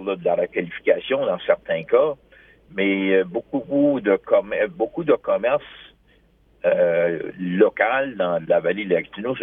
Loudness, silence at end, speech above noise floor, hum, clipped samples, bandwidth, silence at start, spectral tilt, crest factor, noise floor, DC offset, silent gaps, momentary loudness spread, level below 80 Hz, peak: -21 LUFS; 0 s; 37 dB; none; under 0.1%; 3.8 kHz; 0 s; -9.5 dB/octave; 20 dB; -57 dBFS; under 0.1%; none; 7 LU; -60 dBFS; -2 dBFS